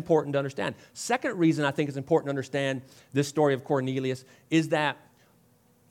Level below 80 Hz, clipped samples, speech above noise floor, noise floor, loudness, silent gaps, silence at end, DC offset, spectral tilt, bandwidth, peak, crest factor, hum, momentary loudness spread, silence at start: -74 dBFS; under 0.1%; 35 dB; -63 dBFS; -28 LUFS; none; 0.95 s; under 0.1%; -5.5 dB/octave; 15.5 kHz; -10 dBFS; 18 dB; none; 9 LU; 0 s